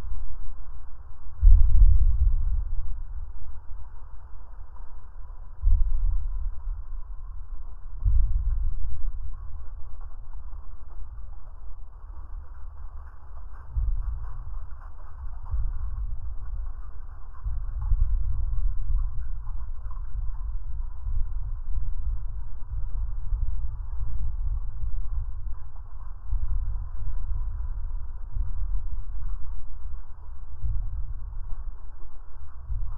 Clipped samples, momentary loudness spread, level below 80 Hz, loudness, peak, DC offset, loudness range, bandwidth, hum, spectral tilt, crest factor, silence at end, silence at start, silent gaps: under 0.1%; 18 LU; -26 dBFS; -33 LUFS; -4 dBFS; under 0.1%; 12 LU; 1.6 kHz; none; -11 dB/octave; 20 dB; 0 s; 0 s; none